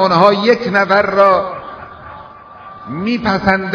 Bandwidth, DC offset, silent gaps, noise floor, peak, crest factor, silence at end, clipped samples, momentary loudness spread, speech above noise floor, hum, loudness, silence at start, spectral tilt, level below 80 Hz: 5.4 kHz; under 0.1%; none; -36 dBFS; 0 dBFS; 14 dB; 0 s; 0.3%; 23 LU; 23 dB; none; -13 LUFS; 0 s; -6.5 dB/octave; -46 dBFS